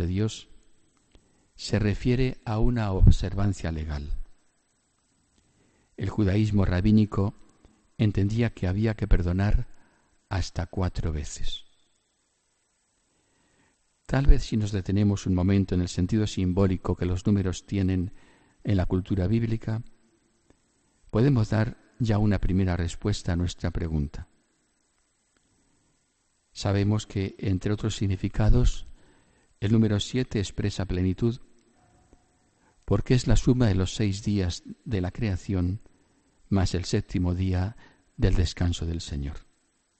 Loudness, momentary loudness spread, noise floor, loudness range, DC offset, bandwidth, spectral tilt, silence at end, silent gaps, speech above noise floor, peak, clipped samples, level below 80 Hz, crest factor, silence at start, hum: -27 LUFS; 11 LU; -72 dBFS; 7 LU; under 0.1%; 8.8 kHz; -7 dB/octave; 0.6 s; none; 47 dB; -6 dBFS; under 0.1%; -34 dBFS; 20 dB; 0 s; none